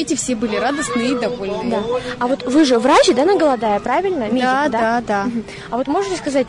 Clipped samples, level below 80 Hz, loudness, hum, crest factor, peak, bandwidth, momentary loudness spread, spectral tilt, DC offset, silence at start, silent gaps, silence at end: under 0.1%; -48 dBFS; -17 LUFS; none; 12 dB; -4 dBFS; 11 kHz; 10 LU; -4 dB/octave; under 0.1%; 0 s; none; 0 s